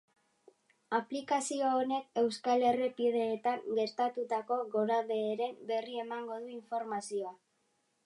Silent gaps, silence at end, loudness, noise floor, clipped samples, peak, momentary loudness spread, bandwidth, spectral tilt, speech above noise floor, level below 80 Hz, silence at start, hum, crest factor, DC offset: none; 0.7 s; -34 LUFS; -77 dBFS; under 0.1%; -16 dBFS; 9 LU; 11.5 kHz; -4 dB/octave; 44 dB; -86 dBFS; 0.9 s; none; 18 dB; under 0.1%